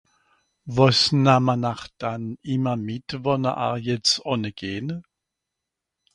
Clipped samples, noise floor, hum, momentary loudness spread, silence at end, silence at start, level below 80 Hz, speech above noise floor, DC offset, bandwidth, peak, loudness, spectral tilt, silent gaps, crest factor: under 0.1%; -84 dBFS; none; 14 LU; 1.15 s; 0.65 s; -56 dBFS; 62 dB; under 0.1%; 11 kHz; -2 dBFS; -23 LUFS; -5 dB/octave; none; 22 dB